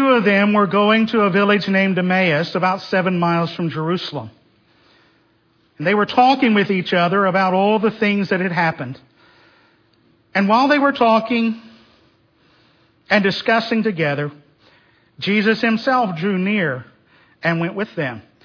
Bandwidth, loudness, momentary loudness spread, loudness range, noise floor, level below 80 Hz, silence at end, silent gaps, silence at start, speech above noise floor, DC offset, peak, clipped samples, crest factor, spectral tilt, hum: 5.4 kHz; -17 LUFS; 10 LU; 5 LU; -59 dBFS; -64 dBFS; 0.25 s; none; 0 s; 42 dB; under 0.1%; -2 dBFS; under 0.1%; 16 dB; -7 dB/octave; none